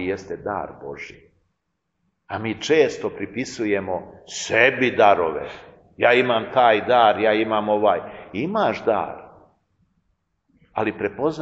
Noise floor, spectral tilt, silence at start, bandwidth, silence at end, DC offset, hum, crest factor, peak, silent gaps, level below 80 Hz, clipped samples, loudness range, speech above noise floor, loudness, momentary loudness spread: -76 dBFS; -4.5 dB/octave; 0 s; 8 kHz; 0 s; under 0.1%; none; 22 dB; 0 dBFS; none; -60 dBFS; under 0.1%; 8 LU; 55 dB; -20 LUFS; 17 LU